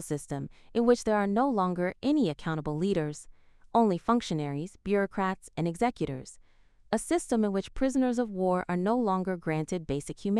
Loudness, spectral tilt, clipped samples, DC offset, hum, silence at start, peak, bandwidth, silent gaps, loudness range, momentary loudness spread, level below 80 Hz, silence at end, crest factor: -29 LUFS; -6.5 dB/octave; under 0.1%; under 0.1%; none; 0 s; -10 dBFS; 14 kHz; none; 2 LU; 9 LU; -52 dBFS; 0 s; 18 dB